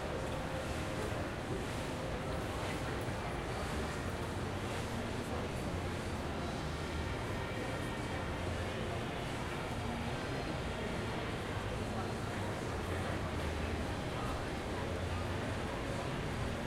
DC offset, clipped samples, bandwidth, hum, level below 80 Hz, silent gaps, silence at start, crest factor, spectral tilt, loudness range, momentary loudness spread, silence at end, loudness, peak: under 0.1%; under 0.1%; 16 kHz; none; -48 dBFS; none; 0 s; 14 dB; -5.5 dB/octave; 1 LU; 1 LU; 0 s; -39 LUFS; -24 dBFS